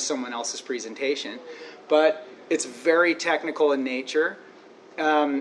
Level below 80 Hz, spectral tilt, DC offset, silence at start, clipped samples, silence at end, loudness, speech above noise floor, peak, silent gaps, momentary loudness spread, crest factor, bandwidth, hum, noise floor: -86 dBFS; -2 dB/octave; under 0.1%; 0 s; under 0.1%; 0 s; -24 LUFS; 24 dB; -6 dBFS; none; 15 LU; 18 dB; 11 kHz; none; -48 dBFS